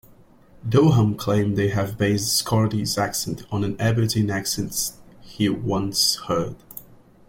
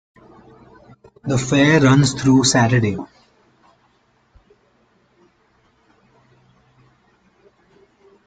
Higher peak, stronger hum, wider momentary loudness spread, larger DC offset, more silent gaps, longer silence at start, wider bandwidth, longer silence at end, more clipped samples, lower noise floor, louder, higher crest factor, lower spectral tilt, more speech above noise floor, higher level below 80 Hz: about the same, -4 dBFS vs -2 dBFS; neither; second, 9 LU vs 17 LU; neither; neither; second, 0.65 s vs 1.25 s; first, 16.5 kHz vs 9.4 kHz; second, 0.45 s vs 5.2 s; neither; second, -51 dBFS vs -60 dBFS; second, -22 LUFS vs -15 LUFS; about the same, 18 dB vs 18 dB; about the same, -4.5 dB/octave vs -5 dB/octave; second, 29 dB vs 45 dB; about the same, -50 dBFS vs -50 dBFS